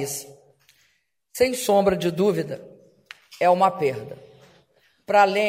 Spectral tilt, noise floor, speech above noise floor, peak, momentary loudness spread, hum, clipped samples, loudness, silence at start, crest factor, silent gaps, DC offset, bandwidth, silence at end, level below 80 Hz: -4.5 dB/octave; -68 dBFS; 47 dB; -4 dBFS; 20 LU; none; under 0.1%; -22 LUFS; 0 s; 20 dB; none; under 0.1%; 16 kHz; 0 s; -58 dBFS